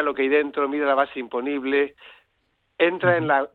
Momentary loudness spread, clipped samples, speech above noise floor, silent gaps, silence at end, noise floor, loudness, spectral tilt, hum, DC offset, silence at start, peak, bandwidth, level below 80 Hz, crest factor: 7 LU; under 0.1%; 48 dB; none; 0.05 s; -70 dBFS; -22 LUFS; -8.5 dB/octave; none; under 0.1%; 0 s; -6 dBFS; 4.3 kHz; -66 dBFS; 16 dB